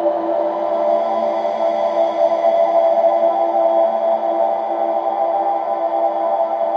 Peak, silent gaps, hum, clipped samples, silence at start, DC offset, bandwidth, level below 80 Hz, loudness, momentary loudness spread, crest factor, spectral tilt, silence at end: -4 dBFS; none; none; under 0.1%; 0 s; under 0.1%; 6.4 kHz; -74 dBFS; -17 LUFS; 5 LU; 12 dB; -6 dB/octave; 0 s